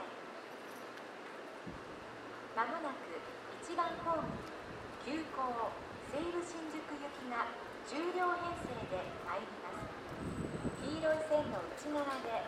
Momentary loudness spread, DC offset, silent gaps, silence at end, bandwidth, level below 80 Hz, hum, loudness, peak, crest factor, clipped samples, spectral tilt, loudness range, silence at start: 13 LU; under 0.1%; none; 0 s; 15 kHz; -64 dBFS; none; -41 LUFS; -22 dBFS; 20 dB; under 0.1%; -5 dB/octave; 3 LU; 0 s